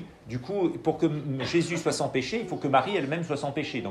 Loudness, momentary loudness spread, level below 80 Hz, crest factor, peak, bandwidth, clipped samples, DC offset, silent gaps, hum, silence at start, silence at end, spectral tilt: -28 LUFS; 6 LU; -60 dBFS; 18 dB; -10 dBFS; 12.5 kHz; under 0.1%; under 0.1%; none; none; 0 s; 0 s; -5.5 dB/octave